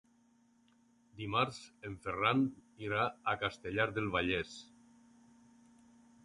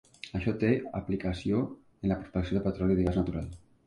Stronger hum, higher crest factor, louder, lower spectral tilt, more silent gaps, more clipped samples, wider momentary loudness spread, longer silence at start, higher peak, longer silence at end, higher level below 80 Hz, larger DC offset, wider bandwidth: neither; first, 24 dB vs 18 dB; second, -35 LUFS vs -31 LUFS; second, -5.5 dB/octave vs -8.5 dB/octave; neither; neither; first, 15 LU vs 9 LU; first, 1.15 s vs 0.25 s; about the same, -14 dBFS vs -14 dBFS; first, 1.6 s vs 0.3 s; second, -62 dBFS vs -44 dBFS; neither; about the same, 11.5 kHz vs 10.5 kHz